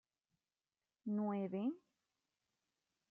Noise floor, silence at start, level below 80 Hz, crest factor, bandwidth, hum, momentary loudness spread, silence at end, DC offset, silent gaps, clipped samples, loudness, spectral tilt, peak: under -90 dBFS; 1.05 s; under -90 dBFS; 16 dB; 3.4 kHz; none; 12 LU; 1.35 s; under 0.1%; none; under 0.1%; -42 LUFS; -8.5 dB/octave; -30 dBFS